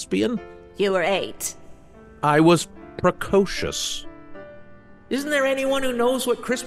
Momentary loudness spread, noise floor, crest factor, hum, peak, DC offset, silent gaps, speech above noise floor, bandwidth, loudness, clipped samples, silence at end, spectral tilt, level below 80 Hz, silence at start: 15 LU; -46 dBFS; 18 dB; none; -4 dBFS; under 0.1%; none; 25 dB; 14.5 kHz; -22 LUFS; under 0.1%; 0 s; -4.5 dB/octave; -48 dBFS; 0 s